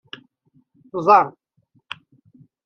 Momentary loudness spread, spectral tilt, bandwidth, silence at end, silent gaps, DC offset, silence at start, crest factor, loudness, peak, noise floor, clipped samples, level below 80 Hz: 25 LU; -6 dB/octave; 6.6 kHz; 1.35 s; none; under 0.1%; 0.95 s; 22 dB; -18 LUFS; -2 dBFS; -62 dBFS; under 0.1%; -74 dBFS